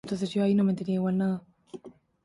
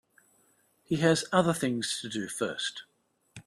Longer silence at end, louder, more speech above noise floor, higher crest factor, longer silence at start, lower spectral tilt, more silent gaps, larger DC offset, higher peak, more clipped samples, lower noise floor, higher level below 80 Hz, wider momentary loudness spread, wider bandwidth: first, 0.35 s vs 0.05 s; about the same, -27 LUFS vs -29 LUFS; second, 21 dB vs 39 dB; second, 12 dB vs 20 dB; second, 0.05 s vs 0.9 s; first, -8 dB/octave vs -4.5 dB/octave; neither; neither; second, -16 dBFS vs -10 dBFS; neither; second, -47 dBFS vs -68 dBFS; about the same, -66 dBFS vs -68 dBFS; first, 22 LU vs 10 LU; second, 11 kHz vs 13.5 kHz